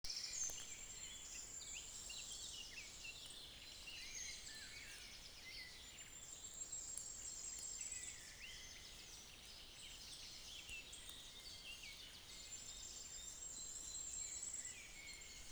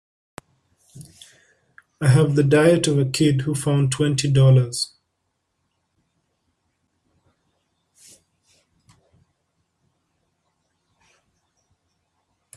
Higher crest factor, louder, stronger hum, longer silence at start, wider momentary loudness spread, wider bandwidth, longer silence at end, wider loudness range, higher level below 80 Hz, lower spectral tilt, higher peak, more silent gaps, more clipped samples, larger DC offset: first, 24 dB vs 18 dB; second, -50 LUFS vs -18 LUFS; neither; second, 0.05 s vs 0.95 s; about the same, 8 LU vs 8 LU; first, over 20 kHz vs 12.5 kHz; second, 0 s vs 7.7 s; about the same, 4 LU vs 6 LU; second, -66 dBFS vs -56 dBFS; second, 0.5 dB/octave vs -6 dB/octave; second, -28 dBFS vs -4 dBFS; neither; neither; neither